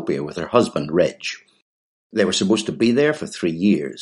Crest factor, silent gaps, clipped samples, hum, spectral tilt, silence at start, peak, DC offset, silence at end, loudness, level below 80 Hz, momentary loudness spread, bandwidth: 18 dB; 1.62-2.10 s; under 0.1%; none; -5 dB/octave; 0 s; -2 dBFS; under 0.1%; 0 s; -20 LUFS; -58 dBFS; 9 LU; 11.5 kHz